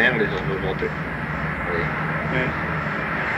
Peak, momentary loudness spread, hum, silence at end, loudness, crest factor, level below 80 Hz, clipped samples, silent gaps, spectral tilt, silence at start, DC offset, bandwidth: -6 dBFS; 4 LU; none; 0 s; -24 LUFS; 18 dB; -40 dBFS; under 0.1%; none; -7 dB/octave; 0 s; under 0.1%; 10.5 kHz